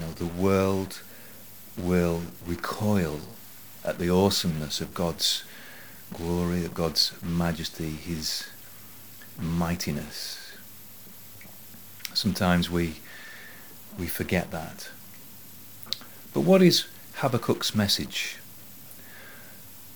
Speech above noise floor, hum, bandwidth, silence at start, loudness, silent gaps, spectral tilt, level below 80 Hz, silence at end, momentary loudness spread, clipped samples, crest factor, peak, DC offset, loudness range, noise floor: 21 dB; none; over 20 kHz; 0 s; -27 LUFS; none; -4.5 dB/octave; -52 dBFS; 0 s; 21 LU; under 0.1%; 22 dB; -6 dBFS; 0.4%; 8 LU; -47 dBFS